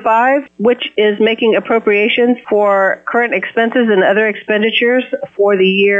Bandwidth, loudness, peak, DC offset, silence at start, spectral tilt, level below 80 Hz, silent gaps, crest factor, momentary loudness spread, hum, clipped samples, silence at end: 7.4 kHz; -13 LUFS; -2 dBFS; under 0.1%; 0 s; -7 dB/octave; -64 dBFS; none; 10 dB; 4 LU; none; under 0.1%; 0 s